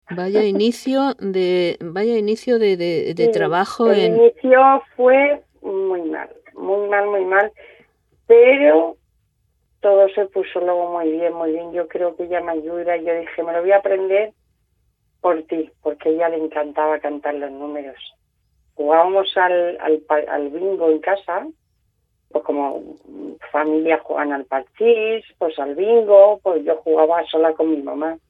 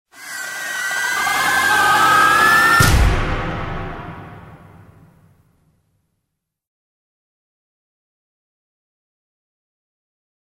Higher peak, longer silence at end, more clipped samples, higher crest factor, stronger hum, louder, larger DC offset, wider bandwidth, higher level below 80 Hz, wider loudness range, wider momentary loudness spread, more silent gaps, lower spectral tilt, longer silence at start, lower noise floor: about the same, 0 dBFS vs -2 dBFS; second, 0.15 s vs 6.05 s; neither; about the same, 18 dB vs 20 dB; neither; second, -18 LUFS vs -15 LUFS; neither; second, 11 kHz vs 16.5 kHz; second, -64 dBFS vs -30 dBFS; second, 7 LU vs 17 LU; second, 13 LU vs 19 LU; neither; first, -6 dB/octave vs -3 dB/octave; about the same, 0.1 s vs 0.15 s; second, -67 dBFS vs -77 dBFS